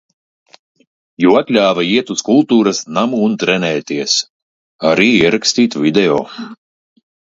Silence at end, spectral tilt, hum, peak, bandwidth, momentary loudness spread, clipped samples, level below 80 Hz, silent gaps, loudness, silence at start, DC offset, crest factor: 0.75 s; -4 dB/octave; none; 0 dBFS; 7.8 kHz; 8 LU; under 0.1%; -54 dBFS; 4.30-4.79 s; -13 LUFS; 1.2 s; under 0.1%; 14 dB